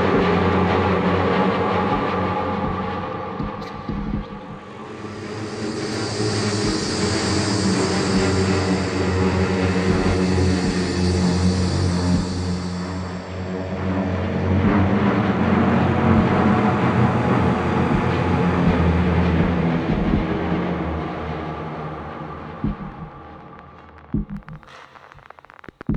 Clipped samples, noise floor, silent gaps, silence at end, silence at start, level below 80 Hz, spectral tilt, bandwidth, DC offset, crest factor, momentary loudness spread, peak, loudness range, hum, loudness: under 0.1%; -45 dBFS; none; 0 s; 0 s; -36 dBFS; -6 dB/octave; 10.5 kHz; under 0.1%; 18 dB; 14 LU; -4 dBFS; 11 LU; none; -21 LUFS